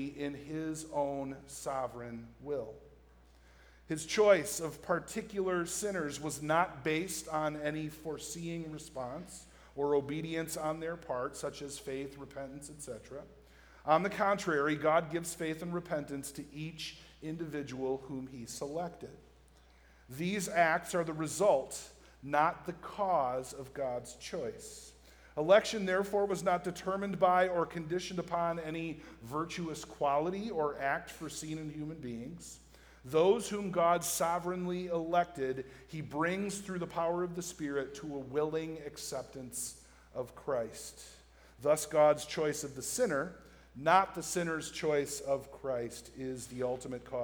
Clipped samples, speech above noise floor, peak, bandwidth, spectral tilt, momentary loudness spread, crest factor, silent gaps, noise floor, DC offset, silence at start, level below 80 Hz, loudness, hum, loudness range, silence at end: under 0.1%; 27 dB; -12 dBFS; over 20 kHz; -4.5 dB/octave; 16 LU; 24 dB; none; -62 dBFS; under 0.1%; 0 s; -62 dBFS; -35 LUFS; none; 8 LU; 0 s